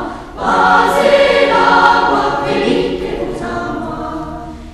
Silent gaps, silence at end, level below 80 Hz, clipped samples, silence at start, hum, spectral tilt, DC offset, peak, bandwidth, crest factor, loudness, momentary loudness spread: none; 0 s; -34 dBFS; under 0.1%; 0 s; none; -4.5 dB/octave; under 0.1%; 0 dBFS; 13.5 kHz; 14 dB; -12 LUFS; 14 LU